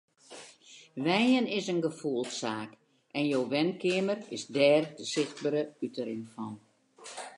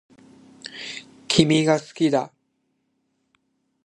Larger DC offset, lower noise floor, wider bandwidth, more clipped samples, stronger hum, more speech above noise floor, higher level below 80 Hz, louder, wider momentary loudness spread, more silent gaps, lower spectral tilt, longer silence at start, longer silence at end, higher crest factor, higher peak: neither; second, -55 dBFS vs -72 dBFS; about the same, 11.5 kHz vs 11.5 kHz; neither; neither; second, 25 dB vs 52 dB; second, -82 dBFS vs -58 dBFS; second, -30 LUFS vs -21 LUFS; about the same, 22 LU vs 20 LU; neither; about the same, -4.5 dB/octave vs -5 dB/octave; second, 0.3 s vs 0.65 s; second, 0 s vs 1.55 s; second, 18 dB vs 24 dB; second, -12 dBFS vs 0 dBFS